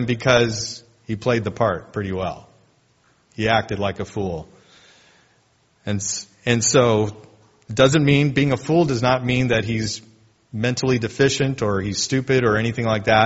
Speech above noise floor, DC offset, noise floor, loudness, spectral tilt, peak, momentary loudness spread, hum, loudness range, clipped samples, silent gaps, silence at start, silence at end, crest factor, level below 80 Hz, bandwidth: 41 dB; under 0.1%; -61 dBFS; -20 LUFS; -4.5 dB/octave; 0 dBFS; 12 LU; none; 8 LU; under 0.1%; none; 0 s; 0 s; 20 dB; -48 dBFS; 8 kHz